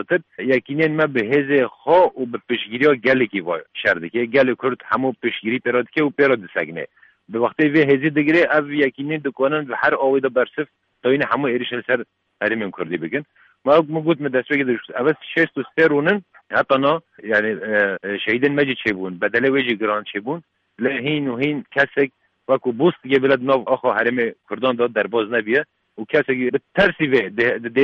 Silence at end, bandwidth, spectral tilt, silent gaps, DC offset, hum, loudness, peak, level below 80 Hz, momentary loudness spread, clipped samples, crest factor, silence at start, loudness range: 0 s; 6.6 kHz; -7.5 dB/octave; none; under 0.1%; none; -19 LUFS; -4 dBFS; -62 dBFS; 8 LU; under 0.1%; 16 dB; 0 s; 3 LU